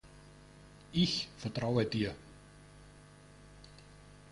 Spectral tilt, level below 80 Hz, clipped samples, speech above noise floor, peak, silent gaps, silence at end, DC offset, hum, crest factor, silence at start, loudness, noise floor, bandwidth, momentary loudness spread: -5.5 dB/octave; -60 dBFS; under 0.1%; 23 dB; -16 dBFS; none; 0 s; under 0.1%; 50 Hz at -60 dBFS; 22 dB; 0.05 s; -34 LUFS; -57 dBFS; 11.5 kHz; 25 LU